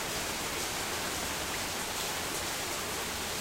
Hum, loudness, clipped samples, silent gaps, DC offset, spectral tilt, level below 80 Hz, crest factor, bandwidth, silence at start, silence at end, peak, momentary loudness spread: none; -33 LUFS; under 0.1%; none; under 0.1%; -1.5 dB/octave; -52 dBFS; 14 dB; 16 kHz; 0 s; 0 s; -22 dBFS; 1 LU